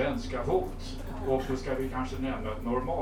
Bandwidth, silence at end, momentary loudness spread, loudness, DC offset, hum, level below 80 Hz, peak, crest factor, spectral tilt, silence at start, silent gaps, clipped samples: 16 kHz; 0 s; 7 LU; -32 LUFS; under 0.1%; none; -40 dBFS; -14 dBFS; 16 dB; -6.5 dB/octave; 0 s; none; under 0.1%